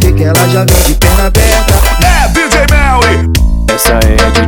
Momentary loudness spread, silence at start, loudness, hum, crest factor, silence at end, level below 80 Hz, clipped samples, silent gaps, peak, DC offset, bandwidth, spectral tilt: 2 LU; 0 s; -8 LUFS; none; 6 dB; 0 s; -10 dBFS; under 0.1%; none; 0 dBFS; under 0.1%; over 20 kHz; -4.5 dB/octave